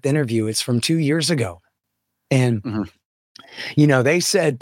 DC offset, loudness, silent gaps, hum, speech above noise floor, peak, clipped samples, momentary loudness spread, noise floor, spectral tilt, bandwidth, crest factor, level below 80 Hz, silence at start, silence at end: under 0.1%; -19 LUFS; 3.05-3.35 s; none; 58 dB; -4 dBFS; under 0.1%; 12 LU; -77 dBFS; -5 dB/octave; 17 kHz; 16 dB; -60 dBFS; 0.05 s; 0.05 s